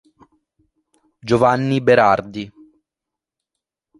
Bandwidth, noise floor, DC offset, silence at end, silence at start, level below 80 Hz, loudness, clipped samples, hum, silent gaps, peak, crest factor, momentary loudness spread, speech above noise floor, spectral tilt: 11.5 kHz; -85 dBFS; under 0.1%; 1.5 s; 1.25 s; -54 dBFS; -16 LUFS; under 0.1%; none; none; -2 dBFS; 20 dB; 20 LU; 70 dB; -7 dB/octave